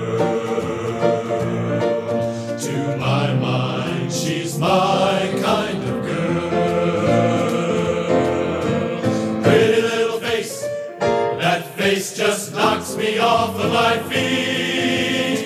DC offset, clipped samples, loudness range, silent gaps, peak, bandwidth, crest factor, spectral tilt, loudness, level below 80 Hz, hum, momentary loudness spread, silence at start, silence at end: under 0.1%; under 0.1%; 3 LU; none; -2 dBFS; 15 kHz; 18 dB; -5 dB/octave; -19 LUFS; -52 dBFS; none; 6 LU; 0 s; 0 s